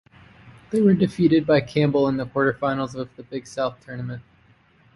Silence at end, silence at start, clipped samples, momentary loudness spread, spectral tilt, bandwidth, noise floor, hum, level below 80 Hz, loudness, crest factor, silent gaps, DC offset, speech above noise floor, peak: 0.75 s; 0.45 s; under 0.1%; 16 LU; -7.5 dB/octave; 11.5 kHz; -57 dBFS; none; -56 dBFS; -22 LUFS; 16 dB; none; under 0.1%; 36 dB; -6 dBFS